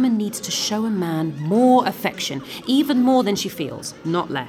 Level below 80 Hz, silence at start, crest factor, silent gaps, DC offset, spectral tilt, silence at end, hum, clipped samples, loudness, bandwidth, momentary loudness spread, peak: -62 dBFS; 0 s; 16 dB; none; under 0.1%; -4.5 dB/octave; 0 s; none; under 0.1%; -20 LUFS; 18.5 kHz; 11 LU; -4 dBFS